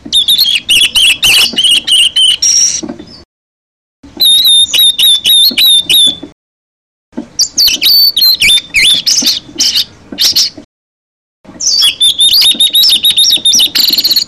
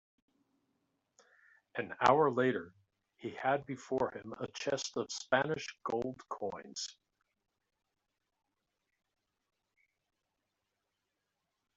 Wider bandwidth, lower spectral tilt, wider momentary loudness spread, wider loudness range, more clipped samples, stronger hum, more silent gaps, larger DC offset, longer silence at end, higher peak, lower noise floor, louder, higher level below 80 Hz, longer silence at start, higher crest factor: first, 14.5 kHz vs 8.2 kHz; second, 2 dB/octave vs -4.5 dB/octave; second, 7 LU vs 15 LU; second, 3 LU vs 14 LU; neither; neither; first, 3.25-4.03 s, 6.32-7.12 s, 10.65-11.44 s vs none; first, 0.3% vs under 0.1%; second, 0 s vs 4.85 s; first, 0 dBFS vs -12 dBFS; first, under -90 dBFS vs -86 dBFS; first, -5 LUFS vs -35 LUFS; first, -44 dBFS vs -74 dBFS; second, 0.05 s vs 1.75 s; second, 10 dB vs 26 dB